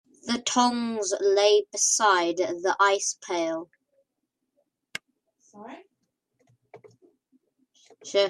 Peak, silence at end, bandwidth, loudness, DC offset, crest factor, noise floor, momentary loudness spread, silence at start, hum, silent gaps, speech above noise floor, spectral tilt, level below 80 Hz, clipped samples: -8 dBFS; 0 s; 13 kHz; -24 LUFS; under 0.1%; 20 dB; -81 dBFS; 19 LU; 0.25 s; none; none; 57 dB; -1 dB/octave; -78 dBFS; under 0.1%